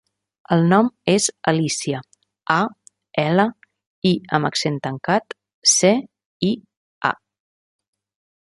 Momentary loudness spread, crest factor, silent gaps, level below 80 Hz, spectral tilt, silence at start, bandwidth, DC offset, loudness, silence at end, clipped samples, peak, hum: 11 LU; 20 dB; 3.87-4.02 s, 5.54-5.62 s, 6.25-6.40 s, 6.77-7.01 s; -64 dBFS; -4 dB/octave; 0.5 s; 11.5 kHz; under 0.1%; -20 LUFS; 1.3 s; under 0.1%; -2 dBFS; none